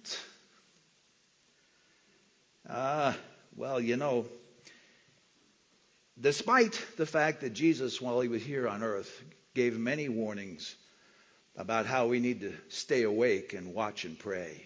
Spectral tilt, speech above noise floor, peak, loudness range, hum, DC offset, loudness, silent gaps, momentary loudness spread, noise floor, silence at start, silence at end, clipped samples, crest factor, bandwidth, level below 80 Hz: -4.5 dB/octave; 37 dB; -12 dBFS; 7 LU; none; under 0.1%; -32 LUFS; none; 15 LU; -69 dBFS; 0.05 s; 0 s; under 0.1%; 22 dB; 8 kHz; -74 dBFS